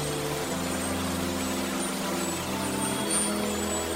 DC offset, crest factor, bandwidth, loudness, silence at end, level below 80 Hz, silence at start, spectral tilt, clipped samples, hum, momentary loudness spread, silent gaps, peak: under 0.1%; 16 dB; 16 kHz; -28 LUFS; 0 s; -54 dBFS; 0 s; -3.5 dB/octave; under 0.1%; none; 4 LU; none; -14 dBFS